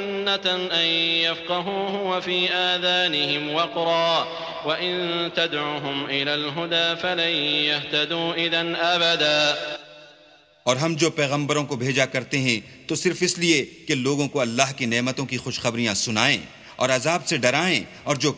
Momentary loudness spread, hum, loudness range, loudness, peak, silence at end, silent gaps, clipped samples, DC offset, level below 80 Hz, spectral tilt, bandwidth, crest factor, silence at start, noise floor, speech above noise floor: 7 LU; none; 2 LU; -22 LUFS; 0 dBFS; 0 s; none; under 0.1%; under 0.1%; -62 dBFS; -3 dB/octave; 8 kHz; 22 dB; 0 s; -53 dBFS; 30 dB